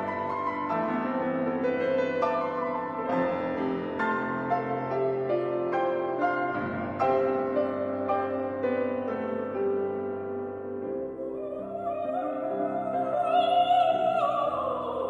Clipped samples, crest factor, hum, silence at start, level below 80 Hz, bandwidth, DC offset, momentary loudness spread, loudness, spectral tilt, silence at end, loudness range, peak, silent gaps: under 0.1%; 16 dB; none; 0 s; -66 dBFS; 7.8 kHz; under 0.1%; 9 LU; -28 LUFS; -7.5 dB/octave; 0 s; 5 LU; -12 dBFS; none